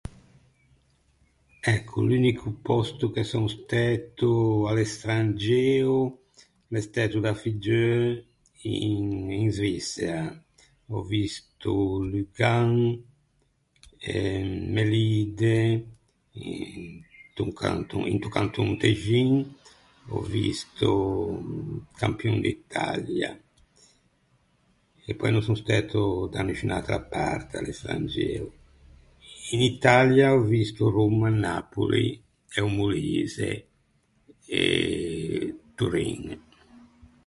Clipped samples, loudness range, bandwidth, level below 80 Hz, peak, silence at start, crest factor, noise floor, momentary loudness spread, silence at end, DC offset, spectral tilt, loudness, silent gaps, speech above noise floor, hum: under 0.1%; 7 LU; 11.5 kHz; -48 dBFS; -4 dBFS; 0.05 s; 24 dB; -69 dBFS; 13 LU; 0.9 s; under 0.1%; -6.5 dB/octave; -26 LUFS; none; 44 dB; none